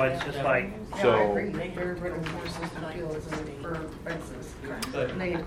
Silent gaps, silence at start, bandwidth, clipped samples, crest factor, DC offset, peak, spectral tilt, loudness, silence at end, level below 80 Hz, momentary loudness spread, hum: none; 0 s; 16.5 kHz; under 0.1%; 20 dB; under 0.1%; -10 dBFS; -6 dB/octave; -30 LUFS; 0 s; -48 dBFS; 12 LU; none